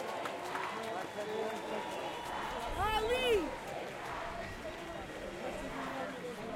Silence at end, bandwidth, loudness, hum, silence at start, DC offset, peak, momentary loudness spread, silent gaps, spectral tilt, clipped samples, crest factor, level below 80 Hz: 0 s; 16.5 kHz; -38 LUFS; none; 0 s; under 0.1%; -20 dBFS; 11 LU; none; -4 dB/octave; under 0.1%; 18 dB; -54 dBFS